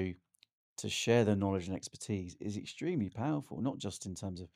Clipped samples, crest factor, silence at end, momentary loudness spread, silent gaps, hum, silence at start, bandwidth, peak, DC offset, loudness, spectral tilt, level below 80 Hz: under 0.1%; 20 dB; 0.1 s; 13 LU; 0.52-0.76 s; none; 0 s; 15.5 kHz; -16 dBFS; under 0.1%; -36 LUFS; -5.5 dB/octave; -68 dBFS